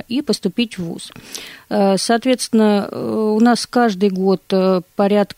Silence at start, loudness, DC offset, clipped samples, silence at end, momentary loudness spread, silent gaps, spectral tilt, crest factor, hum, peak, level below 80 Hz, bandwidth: 0.1 s; -17 LUFS; under 0.1%; under 0.1%; 0.15 s; 14 LU; none; -5 dB/octave; 14 dB; none; -4 dBFS; -58 dBFS; 16 kHz